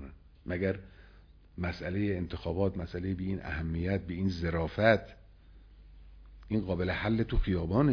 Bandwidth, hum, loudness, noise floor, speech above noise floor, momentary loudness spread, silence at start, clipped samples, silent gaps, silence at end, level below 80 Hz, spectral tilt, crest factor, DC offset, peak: 5.4 kHz; none; -32 LUFS; -56 dBFS; 25 dB; 11 LU; 0 s; under 0.1%; none; 0 s; -42 dBFS; -8.5 dB/octave; 22 dB; under 0.1%; -10 dBFS